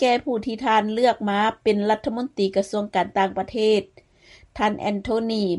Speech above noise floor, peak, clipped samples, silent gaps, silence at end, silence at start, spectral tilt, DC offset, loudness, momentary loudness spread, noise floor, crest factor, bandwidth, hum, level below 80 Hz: 30 dB; -8 dBFS; under 0.1%; none; 0 s; 0 s; -5.5 dB/octave; under 0.1%; -23 LUFS; 4 LU; -52 dBFS; 16 dB; 11.5 kHz; none; -54 dBFS